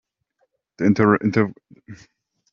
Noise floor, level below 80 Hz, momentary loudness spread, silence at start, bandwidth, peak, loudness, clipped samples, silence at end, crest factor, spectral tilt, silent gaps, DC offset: -70 dBFS; -60 dBFS; 6 LU; 0.8 s; 6.8 kHz; -4 dBFS; -19 LUFS; under 0.1%; 0.55 s; 20 dB; -7 dB/octave; none; under 0.1%